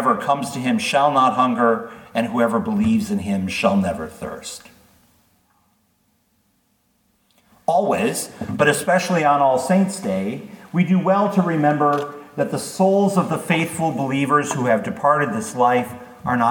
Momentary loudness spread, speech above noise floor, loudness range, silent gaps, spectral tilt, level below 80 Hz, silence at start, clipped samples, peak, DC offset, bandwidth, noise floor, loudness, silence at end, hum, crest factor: 11 LU; 46 dB; 8 LU; none; -5.5 dB/octave; -58 dBFS; 0 s; under 0.1%; -2 dBFS; under 0.1%; 19 kHz; -64 dBFS; -19 LUFS; 0 s; none; 18 dB